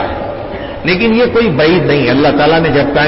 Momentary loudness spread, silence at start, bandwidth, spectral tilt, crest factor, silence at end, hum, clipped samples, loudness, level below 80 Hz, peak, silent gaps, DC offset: 11 LU; 0 s; 5.8 kHz; -10 dB/octave; 10 dB; 0 s; none; under 0.1%; -10 LUFS; -32 dBFS; -2 dBFS; none; under 0.1%